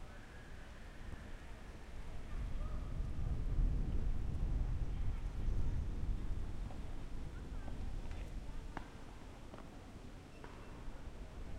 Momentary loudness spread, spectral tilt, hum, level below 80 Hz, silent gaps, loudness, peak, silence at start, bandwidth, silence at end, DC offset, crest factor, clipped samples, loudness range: 13 LU; -7 dB/octave; none; -42 dBFS; none; -46 LUFS; -24 dBFS; 0 s; 9.8 kHz; 0 s; under 0.1%; 16 dB; under 0.1%; 9 LU